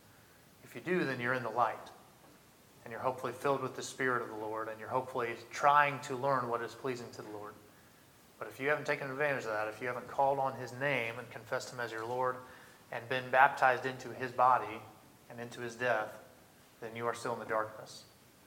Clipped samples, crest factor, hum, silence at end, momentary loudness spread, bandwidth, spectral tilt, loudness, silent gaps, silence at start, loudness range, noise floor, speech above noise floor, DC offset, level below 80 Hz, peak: under 0.1%; 24 dB; none; 0.4 s; 19 LU; 19 kHz; -4.5 dB/octave; -34 LUFS; none; 0.65 s; 6 LU; -61 dBFS; 27 dB; under 0.1%; -78 dBFS; -10 dBFS